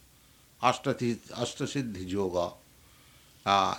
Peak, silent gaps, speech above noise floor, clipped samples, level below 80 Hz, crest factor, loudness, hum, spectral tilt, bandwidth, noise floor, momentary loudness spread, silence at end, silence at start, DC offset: -8 dBFS; none; 30 dB; under 0.1%; -62 dBFS; 24 dB; -31 LUFS; none; -4.5 dB/octave; 19.5 kHz; -59 dBFS; 8 LU; 0 s; 0.6 s; under 0.1%